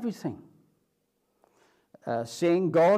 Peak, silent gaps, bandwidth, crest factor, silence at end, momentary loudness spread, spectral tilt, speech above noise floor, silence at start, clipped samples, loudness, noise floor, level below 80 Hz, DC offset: -12 dBFS; none; 14 kHz; 16 dB; 0 s; 18 LU; -6.5 dB/octave; 50 dB; 0 s; under 0.1%; -28 LUFS; -75 dBFS; -74 dBFS; under 0.1%